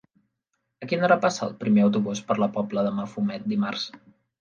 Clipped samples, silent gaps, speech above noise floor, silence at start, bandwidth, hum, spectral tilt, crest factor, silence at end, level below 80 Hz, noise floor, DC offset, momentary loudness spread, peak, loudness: under 0.1%; none; 55 dB; 0.8 s; 7.4 kHz; none; -6 dB/octave; 18 dB; 0.45 s; -70 dBFS; -79 dBFS; under 0.1%; 9 LU; -6 dBFS; -25 LUFS